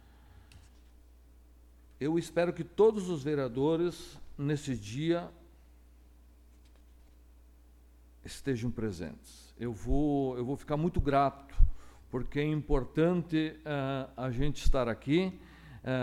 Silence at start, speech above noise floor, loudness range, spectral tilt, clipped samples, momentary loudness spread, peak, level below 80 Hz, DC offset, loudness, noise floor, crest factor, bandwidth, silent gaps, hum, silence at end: 0.55 s; 28 dB; 10 LU; -7 dB/octave; under 0.1%; 14 LU; -10 dBFS; -38 dBFS; under 0.1%; -32 LUFS; -58 dBFS; 22 dB; 12.5 kHz; none; none; 0 s